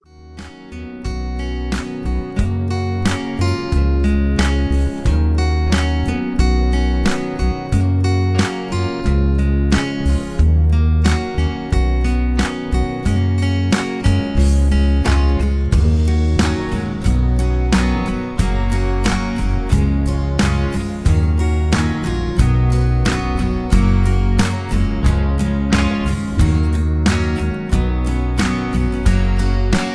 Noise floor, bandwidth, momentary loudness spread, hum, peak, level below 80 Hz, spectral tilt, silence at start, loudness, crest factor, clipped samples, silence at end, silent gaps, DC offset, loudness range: -36 dBFS; 11 kHz; 5 LU; none; 0 dBFS; -18 dBFS; -6.5 dB/octave; 0.2 s; -18 LUFS; 14 dB; under 0.1%; 0 s; none; under 0.1%; 2 LU